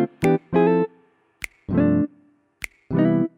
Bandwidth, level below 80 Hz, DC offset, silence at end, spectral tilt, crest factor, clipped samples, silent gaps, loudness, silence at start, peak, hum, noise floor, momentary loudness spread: 15.5 kHz; -52 dBFS; under 0.1%; 0.1 s; -8 dB/octave; 16 dB; under 0.1%; none; -21 LUFS; 0 s; -6 dBFS; none; -58 dBFS; 17 LU